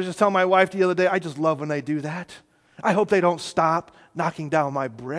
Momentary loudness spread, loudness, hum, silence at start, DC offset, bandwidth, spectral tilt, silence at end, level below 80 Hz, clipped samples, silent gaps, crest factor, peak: 10 LU; -22 LUFS; none; 0 s; under 0.1%; 11 kHz; -6 dB/octave; 0 s; -66 dBFS; under 0.1%; none; 20 dB; -2 dBFS